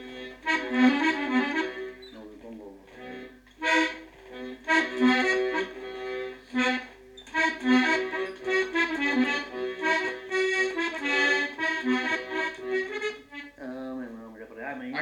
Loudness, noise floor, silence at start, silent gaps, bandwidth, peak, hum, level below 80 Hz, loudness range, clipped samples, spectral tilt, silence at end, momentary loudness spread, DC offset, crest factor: -26 LUFS; -48 dBFS; 0 s; none; 10.5 kHz; -8 dBFS; none; -62 dBFS; 4 LU; under 0.1%; -3 dB/octave; 0 s; 20 LU; under 0.1%; 20 dB